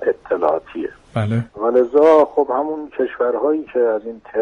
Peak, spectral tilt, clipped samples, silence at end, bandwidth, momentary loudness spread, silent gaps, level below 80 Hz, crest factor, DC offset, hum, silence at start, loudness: -2 dBFS; -9 dB/octave; under 0.1%; 0 s; 6.8 kHz; 13 LU; none; -56 dBFS; 14 dB; under 0.1%; none; 0 s; -18 LUFS